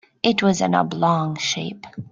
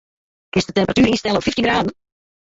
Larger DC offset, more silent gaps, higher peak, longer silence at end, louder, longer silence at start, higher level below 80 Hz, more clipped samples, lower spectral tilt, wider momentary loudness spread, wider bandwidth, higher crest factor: neither; neither; about the same, -2 dBFS vs -4 dBFS; second, 0.05 s vs 0.6 s; about the same, -20 LUFS vs -18 LUFS; second, 0.25 s vs 0.55 s; second, -60 dBFS vs -44 dBFS; neither; about the same, -4.5 dB/octave vs -5 dB/octave; first, 10 LU vs 7 LU; first, 9.2 kHz vs 8 kHz; about the same, 20 dB vs 16 dB